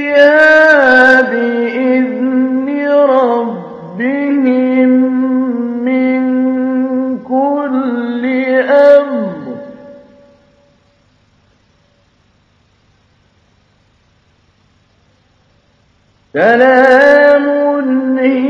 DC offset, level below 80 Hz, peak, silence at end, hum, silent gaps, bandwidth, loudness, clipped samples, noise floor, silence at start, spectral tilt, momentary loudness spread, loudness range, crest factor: under 0.1%; -58 dBFS; 0 dBFS; 0 s; none; none; 7.2 kHz; -10 LUFS; 0.3%; -53 dBFS; 0 s; -6 dB/octave; 12 LU; 5 LU; 12 dB